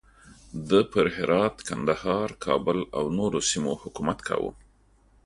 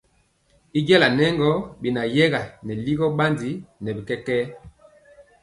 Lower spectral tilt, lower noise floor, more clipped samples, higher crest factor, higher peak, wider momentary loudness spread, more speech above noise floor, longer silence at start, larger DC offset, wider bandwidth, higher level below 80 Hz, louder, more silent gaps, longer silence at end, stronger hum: second, -4.5 dB/octave vs -6.5 dB/octave; about the same, -60 dBFS vs -63 dBFS; neither; about the same, 20 dB vs 22 dB; second, -6 dBFS vs 0 dBFS; second, 7 LU vs 15 LU; second, 34 dB vs 42 dB; second, 0.25 s vs 0.75 s; neither; about the same, 11.5 kHz vs 11.5 kHz; about the same, -52 dBFS vs -54 dBFS; second, -26 LUFS vs -22 LUFS; neither; about the same, 0.7 s vs 0.75 s; neither